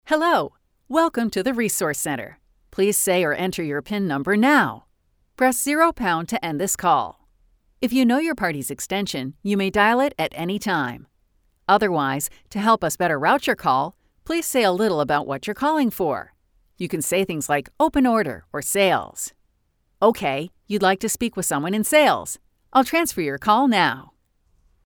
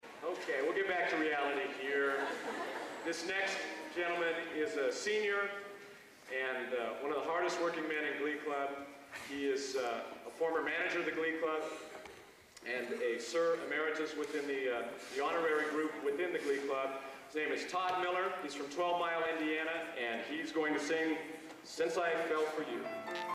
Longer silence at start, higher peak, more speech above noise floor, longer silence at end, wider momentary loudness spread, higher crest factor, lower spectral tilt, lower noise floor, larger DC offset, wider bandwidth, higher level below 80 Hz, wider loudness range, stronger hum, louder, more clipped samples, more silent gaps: about the same, 0.05 s vs 0.05 s; first, -4 dBFS vs -24 dBFS; first, 46 dB vs 21 dB; first, 0.85 s vs 0 s; about the same, 10 LU vs 9 LU; about the same, 18 dB vs 14 dB; about the same, -4 dB/octave vs -3 dB/octave; first, -67 dBFS vs -57 dBFS; neither; first, over 20 kHz vs 15 kHz; first, -54 dBFS vs -78 dBFS; about the same, 2 LU vs 2 LU; neither; first, -21 LUFS vs -37 LUFS; neither; neither